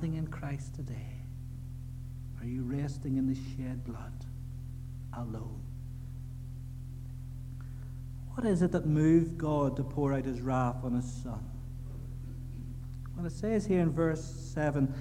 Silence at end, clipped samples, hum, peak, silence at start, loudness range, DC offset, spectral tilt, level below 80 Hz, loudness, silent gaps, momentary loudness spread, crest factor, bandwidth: 0 s; under 0.1%; none; -14 dBFS; 0 s; 12 LU; under 0.1%; -8 dB/octave; -46 dBFS; -35 LUFS; none; 15 LU; 20 dB; 15 kHz